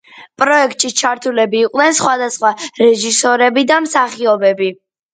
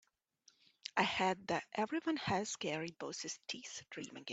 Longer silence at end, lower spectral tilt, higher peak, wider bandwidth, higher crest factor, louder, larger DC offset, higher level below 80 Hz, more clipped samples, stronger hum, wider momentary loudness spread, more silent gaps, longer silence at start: first, 0.4 s vs 0 s; second, -2 dB/octave vs -3.5 dB/octave; first, 0 dBFS vs -18 dBFS; first, 9.6 kHz vs 8.2 kHz; second, 14 dB vs 22 dB; first, -13 LUFS vs -39 LUFS; neither; first, -64 dBFS vs -76 dBFS; neither; neither; second, 5 LU vs 12 LU; neither; second, 0.15 s vs 0.95 s